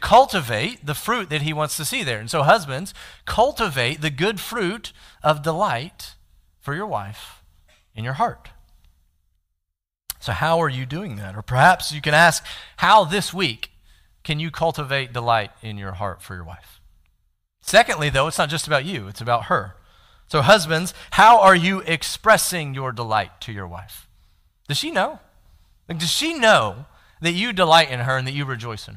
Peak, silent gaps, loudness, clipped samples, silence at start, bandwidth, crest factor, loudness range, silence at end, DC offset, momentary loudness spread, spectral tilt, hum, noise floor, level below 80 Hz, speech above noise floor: -2 dBFS; none; -19 LUFS; under 0.1%; 0 s; 16 kHz; 20 dB; 10 LU; 0 s; under 0.1%; 19 LU; -4 dB/octave; none; -81 dBFS; -48 dBFS; 61 dB